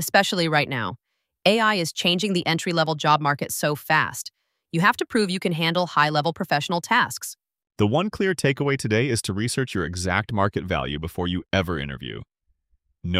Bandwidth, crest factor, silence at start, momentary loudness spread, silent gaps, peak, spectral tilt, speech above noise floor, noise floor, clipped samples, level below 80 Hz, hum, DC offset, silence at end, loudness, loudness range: 16 kHz; 20 dB; 0 s; 9 LU; none; -4 dBFS; -4.5 dB/octave; 46 dB; -69 dBFS; under 0.1%; -50 dBFS; none; under 0.1%; 0 s; -23 LUFS; 4 LU